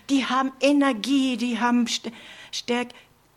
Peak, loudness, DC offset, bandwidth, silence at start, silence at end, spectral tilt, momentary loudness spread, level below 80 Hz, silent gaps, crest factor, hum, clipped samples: -8 dBFS; -23 LUFS; under 0.1%; 13.5 kHz; 0.1 s; 0.4 s; -3 dB/octave; 13 LU; -66 dBFS; none; 16 dB; none; under 0.1%